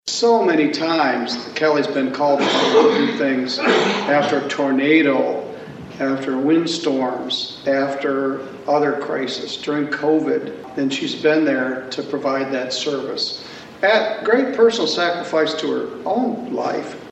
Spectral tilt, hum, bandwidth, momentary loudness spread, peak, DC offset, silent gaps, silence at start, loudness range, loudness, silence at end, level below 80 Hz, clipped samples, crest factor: -4 dB/octave; none; 8.4 kHz; 9 LU; -2 dBFS; under 0.1%; none; 0.05 s; 4 LU; -19 LUFS; 0 s; -64 dBFS; under 0.1%; 18 dB